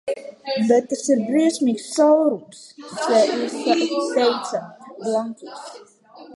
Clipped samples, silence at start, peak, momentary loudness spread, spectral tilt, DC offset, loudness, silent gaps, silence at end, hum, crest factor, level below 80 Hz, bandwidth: under 0.1%; 0.05 s; -4 dBFS; 18 LU; -4 dB/octave; under 0.1%; -20 LUFS; none; 0 s; none; 16 dB; -76 dBFS; 11.5 kHz